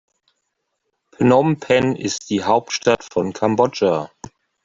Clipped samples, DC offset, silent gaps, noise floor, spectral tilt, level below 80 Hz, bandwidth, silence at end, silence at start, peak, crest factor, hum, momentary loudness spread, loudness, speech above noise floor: under 0.1%; under 0.1%; none; -74 dBFS; -5 dB/octave; -56 dBFS; 7.8 kHz; 0.6 s; 1.2 s; -2 dBFS; 18 dB; none; 8 LU; -18 LUFS; 56 dB